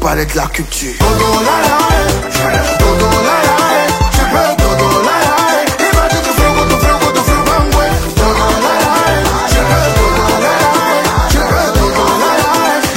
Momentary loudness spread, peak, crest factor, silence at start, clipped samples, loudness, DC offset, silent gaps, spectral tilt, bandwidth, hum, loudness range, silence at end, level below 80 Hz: 3 LU; 0 dBFS; 10 dB; 0 s; under 0.1%; -11 LUFS; under 0.1%; none; -4 dB/octave; 16.5 kHz; none; 0 LU; 0 s; -18 dBFS